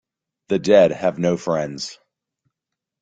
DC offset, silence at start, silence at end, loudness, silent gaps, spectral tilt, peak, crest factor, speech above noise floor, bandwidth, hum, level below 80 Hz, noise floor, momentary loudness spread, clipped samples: under 0.1%; 0.5 s; 1.1 s; -19 LUFS; none; -5.5 dB/octave; -2 dBFS; 18 dB; 66 dB; 9.2 kHz; none; -60 dBFS; -84 dBFS; 15 LU; under 0.1%